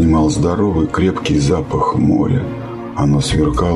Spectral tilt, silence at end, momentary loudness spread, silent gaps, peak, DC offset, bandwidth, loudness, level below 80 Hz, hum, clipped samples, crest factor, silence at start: -6.5 dB/octave; 0 s; 5 LU; none; -2 dBFS; under 0.1%; 11.5 kHz; -15 LUFS; -26 dBFS; none; under 0.1%; 12 dB; 0 s